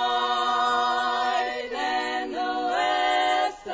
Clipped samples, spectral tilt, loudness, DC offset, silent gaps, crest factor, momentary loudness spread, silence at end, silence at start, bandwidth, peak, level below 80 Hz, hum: under 0.1%; -1.5 dB/octave; -24 LUFS; under 0.1%; none; 12 dB; 6 LU; 0 s; 0 s; 7.8 kHz; -12 dBFS; -62 dBFS; none